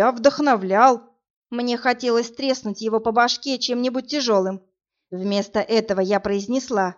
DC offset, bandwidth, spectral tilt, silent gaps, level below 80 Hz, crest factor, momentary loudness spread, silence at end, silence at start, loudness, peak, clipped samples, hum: under 0.1%; 7.6 kHz; -3 dB/octave; 1.30-1.42 s; -60 dBFS; 20 dB; 10 LU; 0.05 s; 0 s; -21 LUFS; -2 dBFS; under 0.1%; none